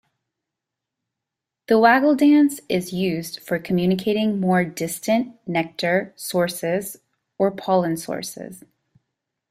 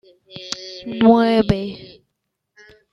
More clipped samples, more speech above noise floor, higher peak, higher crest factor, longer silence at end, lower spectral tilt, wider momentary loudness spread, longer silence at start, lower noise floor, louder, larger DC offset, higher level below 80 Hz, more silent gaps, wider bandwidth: neither; first, 64 dB vs 60 dB; about the same, -2 dBFS vs -2 dBFS; about the same, 20 dB vs 18 dB; about the same, 0.95 s vs 1.05 s; about the same, -5.5 dB/octave vs -6.5 dB/octave; second, 12 LU vs 23 LU; first, 1.7 s vs 0.35 s; first, -85 dBFS vs -76 dBFS; second, -21 LUFS vs -17 LUFS; neither; second, -62 dBFS vs -44 dBFS; neither; first, 16 kHz vs 7.6 kHz